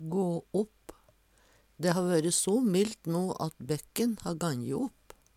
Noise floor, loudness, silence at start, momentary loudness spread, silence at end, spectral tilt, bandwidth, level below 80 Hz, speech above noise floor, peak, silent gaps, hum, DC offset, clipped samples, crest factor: -65 dBFS; -31 LUFS; 0 s; 9 LU; 0.5 s; -5 dB/octave; 16.5 kHz; -64 dBFS; 35 dB; -10 dBFS; none; none; under 0.1%; under 0.1%; 20 dB